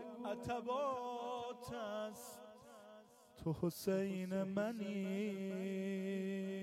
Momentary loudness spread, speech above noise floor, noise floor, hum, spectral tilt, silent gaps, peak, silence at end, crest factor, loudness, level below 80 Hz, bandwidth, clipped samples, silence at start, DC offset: 17 LU; 21 dB; -62 dBFS; none; -6.5 dB/octave; none; -26 dBFS; 0 s; 16 dB; -42 LUFS; -74 dBFS; 16 kHz; under 0.1%; 0 s; under 0.1%